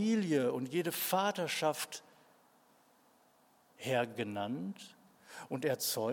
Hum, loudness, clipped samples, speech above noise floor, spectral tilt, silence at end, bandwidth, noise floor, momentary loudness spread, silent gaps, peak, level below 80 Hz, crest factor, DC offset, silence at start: none; -35 LUFS; under 0.1%; 33 dB; -4 dB/octave; 0 s; 17.5 kHz; -68 dBFS; 16 LU; none; -18 dBFS; -88 dBFS; 18 dB; under 0.1%; 0 s